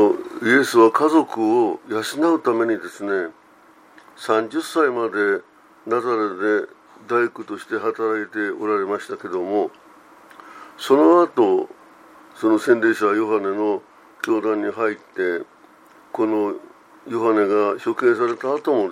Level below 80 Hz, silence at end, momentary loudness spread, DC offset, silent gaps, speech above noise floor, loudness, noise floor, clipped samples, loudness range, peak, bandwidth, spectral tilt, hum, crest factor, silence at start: -76 dBFS; 0 s; 13 LU; under 0.1%; none; 31 dB; -20 LUFS; -51 dBFS; under 0.1%; 6 LU; -2 dBFS; 15.5 kHz; -5 dB/octave; none; 18 dB; 0 s